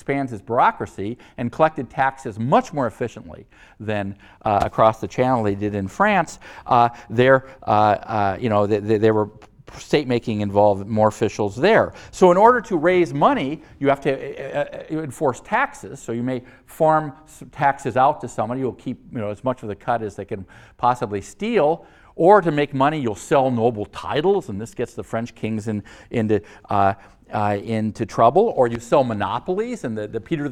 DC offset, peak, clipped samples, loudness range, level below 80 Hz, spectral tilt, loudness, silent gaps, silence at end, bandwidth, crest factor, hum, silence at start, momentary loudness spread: under 0.1%; 0 dBFS; under 0.1%; 6 LU; -52 dBFS; -6.5 dB/octave; -21 LUFS; none; 0 s; 14 kHz; 20 dB; none; 0.1 s; 13 LU